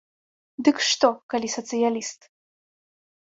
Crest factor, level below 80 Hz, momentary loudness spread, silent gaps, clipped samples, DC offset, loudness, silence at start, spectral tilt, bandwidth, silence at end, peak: 22 dB; -72 dBFS; 12 LU; 1.23-1.29 s; under 0.1%; under 0.1%; -23 LUFS; 0.6 s; -2 dB/octave; 8 kHz; 1.1 s; -4 dBFS